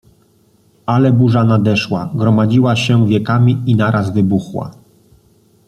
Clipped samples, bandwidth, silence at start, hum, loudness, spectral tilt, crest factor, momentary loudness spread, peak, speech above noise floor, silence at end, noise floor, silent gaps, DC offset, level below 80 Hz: under 0.1%; 9.6 kHz; 0.9 s; none; -13 LUFS; -7.5 dB/octave; 12 dB; 8 LU; -2 dBFS; 40 dB; 0.95 s; -53 dBFS; none; under 0.1%; -50 dBFS